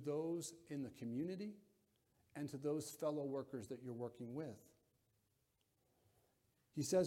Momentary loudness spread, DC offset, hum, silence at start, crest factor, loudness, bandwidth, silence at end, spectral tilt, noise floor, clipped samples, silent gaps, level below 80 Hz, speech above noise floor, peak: 10 LU; under 0.1%; none; 0 s; 20 dB; -46 LUFS; 16.5 kHz; 0 s; -5.5 dB/octave; -83 dBFS; under 0.1%; none; -82 dBFS; 39 dB; -26 dBFS